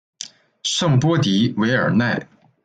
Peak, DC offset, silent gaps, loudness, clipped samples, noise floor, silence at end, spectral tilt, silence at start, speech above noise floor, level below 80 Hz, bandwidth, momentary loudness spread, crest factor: -6 dBFS; under 0.1%; none; -19 LUFS; under 0.1%; -39 dBFS; 0.4 s; -5 dB/octave; 0.2 s; 21 dB; -58 dBFS; 9.4 kHz; 17 LU; 14 dB